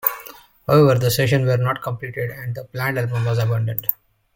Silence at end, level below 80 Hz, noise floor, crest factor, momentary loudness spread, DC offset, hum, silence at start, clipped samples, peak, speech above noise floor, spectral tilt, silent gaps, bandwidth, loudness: 0.4 s; -52 dBFS; -42 dBFS; 20 dB; 15 LU; under 0.1%; none; 0.05 s; under 0.1%; 0 dBFS; 23 dB; -6 dB/octave; none; 17 kHz; -20 LUFS